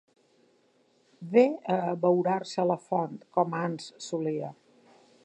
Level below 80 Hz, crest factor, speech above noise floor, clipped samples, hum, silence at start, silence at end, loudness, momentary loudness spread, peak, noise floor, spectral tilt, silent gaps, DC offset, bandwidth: -82 dBFS; 22 dB; 39 dB; under 0.1%; none; 1.2 s; 0.7 s; -28 LUFS; 12 LU; -8 dBFS; -67 dBFS; -6.5 dB/octave; none; under 0.1%; 9.6 kHz